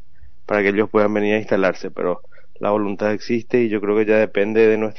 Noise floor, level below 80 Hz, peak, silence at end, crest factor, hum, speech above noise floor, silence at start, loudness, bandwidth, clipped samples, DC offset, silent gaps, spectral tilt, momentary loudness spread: -43 dBFS; -56 dBFS; -4 dBFS; 0.05 s; 14 dB; none; 25 dB; 0.5 s; -19 LUFS; 6.4 kHz; under 0.1%; 3%; none; -5 dB/octave; 8 LU